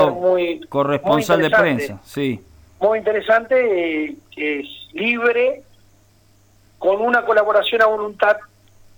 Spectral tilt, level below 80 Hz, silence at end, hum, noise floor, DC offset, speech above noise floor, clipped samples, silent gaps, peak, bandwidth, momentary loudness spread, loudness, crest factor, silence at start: -5.5 dB/octave; -56 dBFS; 0.5 s; none; -54 dBFS; under 0.1%; 36 dB; under 0.1%; none; -4 dBFS; 19.5 kHz; 10 LU; -18 LUFS; 14 dB; 0 s